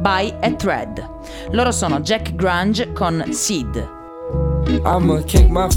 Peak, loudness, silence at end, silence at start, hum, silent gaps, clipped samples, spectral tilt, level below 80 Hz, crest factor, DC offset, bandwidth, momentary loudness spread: 0 dBFS; -18 LUFS; 0 s; 0 s; none; none; under 0.1%; -5 dB/octave; -22 dBFS; 16 dB; under 0.1%; 18 kHz; 14 LU